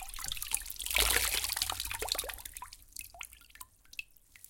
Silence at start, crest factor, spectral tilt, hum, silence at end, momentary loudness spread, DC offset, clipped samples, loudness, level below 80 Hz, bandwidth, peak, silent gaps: 0 s; 28 dB; 0 dB/octave; none; 0.15 s; 20 LU; under 0.1%; under 0.1%; -32 LUFS; -50 dBFS; 17 kHz; -10 dBFS; none